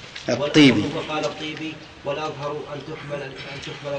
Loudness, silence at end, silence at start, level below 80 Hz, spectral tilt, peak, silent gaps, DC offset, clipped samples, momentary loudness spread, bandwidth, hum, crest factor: -23 LUFS; 0 s; 0 s; -56 dBFS; -5 dB/octave; -4 dBFS; none; under 0.1%; under 0.1%; 18 LU; 9 kHz; none; 20 dB